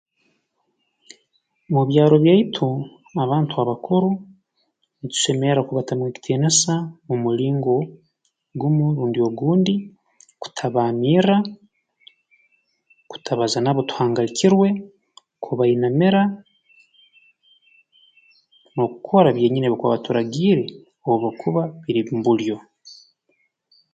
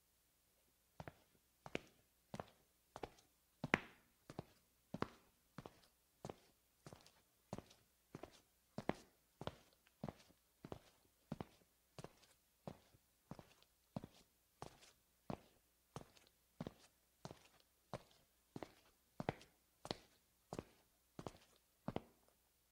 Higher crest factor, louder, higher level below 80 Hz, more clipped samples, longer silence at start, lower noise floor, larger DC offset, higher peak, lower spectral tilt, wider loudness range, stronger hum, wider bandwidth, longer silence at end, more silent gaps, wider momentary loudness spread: second, 20 dB vs 42 dB; first, -20 LUFS vs -53 LUFS; first, -64 dBFS vs -76 dBFS; neither; first, 1.7 s vs 1 s; second, -71 dBFS vs -79 dBFS; neither; first, -2 dBFS vs -14 dBFS; about the same, -5.5 dB/octave vs -5.5 dB/octave; second, 4 LU vs 10 LU; neither; second, 9.4 kHz vs 16 kHz; first, 1 s vs 0.6 s; neither; second, 13 LU vs 16 LU